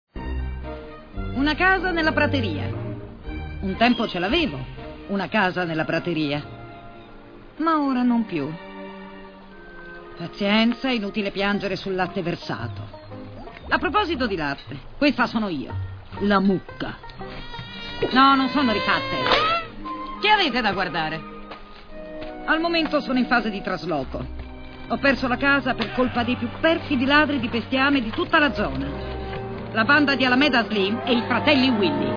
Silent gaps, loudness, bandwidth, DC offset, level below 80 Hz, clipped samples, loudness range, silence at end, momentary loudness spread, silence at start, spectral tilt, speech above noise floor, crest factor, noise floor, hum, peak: none; -22 LUFS; 5.4 kHz; under 0.1%; -40 dBFS; under 0.1%; 6 LU; 0 s; 20 LU; 0.15 s; -6.5 dB/octave; 21 dB; 20 dB; -43 dBFS; none; -2 dBFS